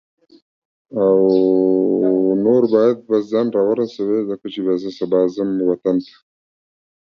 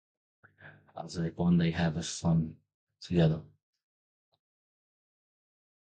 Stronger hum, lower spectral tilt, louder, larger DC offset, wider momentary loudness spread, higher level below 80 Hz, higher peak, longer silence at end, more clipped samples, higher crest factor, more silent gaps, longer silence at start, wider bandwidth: neither; first, -8.5 dB/octave vs -6.5 dB/octave; first, -17 LUFS vs -30 LUFS; neither; second, 7 LU vs 16 LU; second, -64 dBFS vs -54 dBFS; first, -2 dBFS vs -14 dBFS; second, 1.1 s vs 2.4 s; neither; about the same, 16 dB vs 20 dB; second, none vs 2.74-2.87 s; first, 0.9 s vs 0.65 s; second, 6.6 kHz vs 9.2 kHz